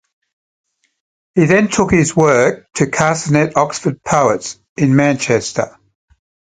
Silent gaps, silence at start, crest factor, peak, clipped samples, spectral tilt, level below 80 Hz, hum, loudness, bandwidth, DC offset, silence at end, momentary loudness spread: 4.69-4.76 s; 1.35 s; 16 dB; 0 dBFS; under 0.1%; -5.5 dB/octave; -44 dBFS; none; -14 LUFS; 9.6 kHz; under 0.1%; 0.85 s; 9 LU